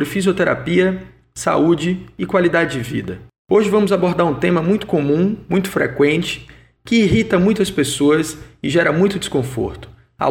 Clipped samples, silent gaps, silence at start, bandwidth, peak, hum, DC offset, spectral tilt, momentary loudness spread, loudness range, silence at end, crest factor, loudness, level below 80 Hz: under 0.1%; 3.38-3.45 s; 0 s; 17 kHz; -2 dBFS; none; under 0.1%; -5.5 dB/octave; 10 LU; 1 LU; 0 s; 14 dB; -17 LUFS; -44 dBFS